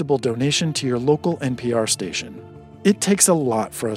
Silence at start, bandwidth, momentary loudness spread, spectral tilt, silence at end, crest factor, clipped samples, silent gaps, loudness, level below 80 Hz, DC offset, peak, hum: 0 s; 16 kHz; 10 LU; -4 dB/octave; 0 s; 20 dB; under 0.1%; none; -20 LUFS; -56 dBFS; under 0.1%; -2 dBFS; none